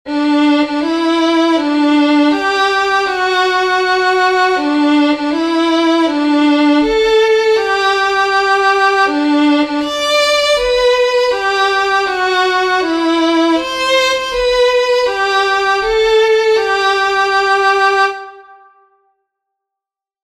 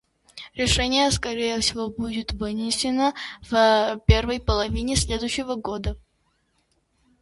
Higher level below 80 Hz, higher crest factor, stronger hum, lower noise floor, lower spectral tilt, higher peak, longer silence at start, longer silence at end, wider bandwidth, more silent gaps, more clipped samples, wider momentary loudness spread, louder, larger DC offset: second, -44 dBFS vs -34 dBFS; second, 12 dB vs 22 dB; neither; first, -85 dBFS vs -69 dBFS; second, -2.5 dB/octave vs -4 dB/octave; about the same, -2 dBFS vs -2 dBFS; second, 0.05 s vs 0.35 s; first, 1.85 s vs 1.25 s; first, 13.5 kHz vs 11.5 kHz; neither; neither; second, 3 LU vs 11 LU; first, -12 LUFS vs -23 LUFS; neither